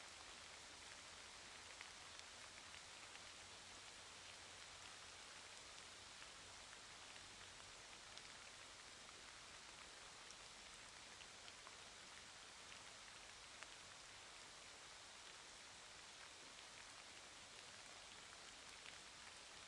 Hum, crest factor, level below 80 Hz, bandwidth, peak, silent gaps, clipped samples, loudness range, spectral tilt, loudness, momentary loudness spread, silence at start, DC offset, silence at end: none; 26 dB; -80 dBFS; 12 kHz; -34 dBFS; none; under 0.1%; 1 LU; -0.5 dB/octave; -57 LUFS; 1 LU; 0 s; under 0.1%; 0 s